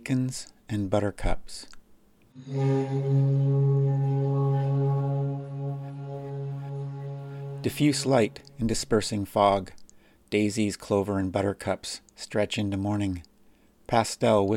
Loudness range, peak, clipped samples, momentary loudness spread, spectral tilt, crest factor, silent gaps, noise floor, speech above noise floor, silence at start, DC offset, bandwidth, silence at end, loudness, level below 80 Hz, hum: 4 LU; -6 dBFS; under 0.1%; 14 LU; -6.5 dB/octave; 20 dB; none; -58 dBFS; 33 dB; 0 s; under 0.1%; 13.5 kHz; 0 s; -27 LUFS; -46 dBFS; none